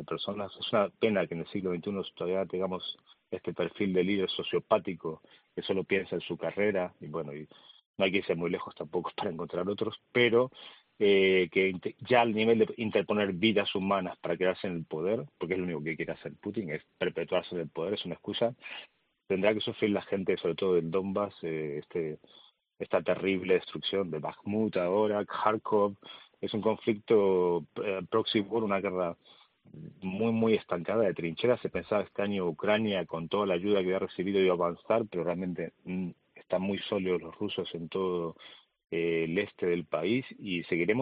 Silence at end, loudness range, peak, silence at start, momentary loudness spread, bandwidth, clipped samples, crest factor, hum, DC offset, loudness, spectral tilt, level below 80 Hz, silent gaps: 0 s; 6 LU; -10 dBFS; 0 s; 11 LU; 5 kHz; under 0.1%; 22 dB; none; under 0.1%; -31 LUFS; -4 dB/octave; -72 dBFS; 7.86-7.94 s